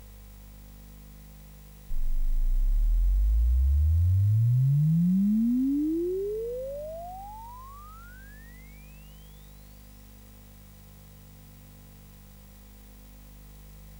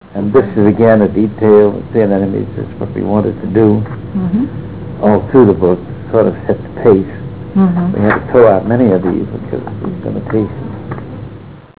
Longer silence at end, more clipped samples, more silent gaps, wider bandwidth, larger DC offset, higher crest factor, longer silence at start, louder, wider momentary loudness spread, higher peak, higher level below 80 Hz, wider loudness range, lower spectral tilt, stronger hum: second, 0 s vs 0.15 s; neither; neither; first, 20 kHz vs 4 kHz; second, under 0.1% vs 1%; about the same, 10 dB vs 12 dB; about the same, 0 s vs 0.05 s; second, -27 LUFS vs -12 LUFS; first, 27 LU vs 15 LU; second, -18 dBFS vs 0 dBFS; first, -32 dBFS vs -38 dBFS; first, 24 LU vs 3 LU; second, -9.5 dB/octave vs -13 dB/octave; first, 50 Hz at -50 dBFS vs none